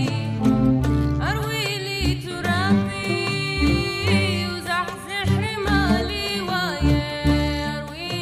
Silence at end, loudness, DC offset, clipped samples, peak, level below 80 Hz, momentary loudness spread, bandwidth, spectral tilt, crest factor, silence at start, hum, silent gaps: 0 s; -22 LUFS; under 0.1%; under 0.1%; -8 dBFS; -32 dBFS; 5 LU; 15.5 kHz; -5.5 dB/octave; 14 dB; 0 s; none; none